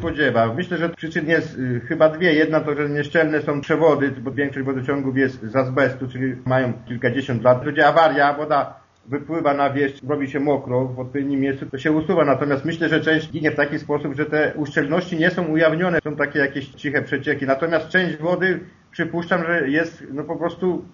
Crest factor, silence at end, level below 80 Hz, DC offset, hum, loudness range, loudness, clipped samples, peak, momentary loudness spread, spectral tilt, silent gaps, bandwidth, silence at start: 18 dB; 0.05 s; -56 dBFS; under 0.1%; none; 3 LU; -20 LUFS; under 0.1%; -2 dBFS; 8 LU; -5 dB/octave; none; 7.2 kHz; 0 s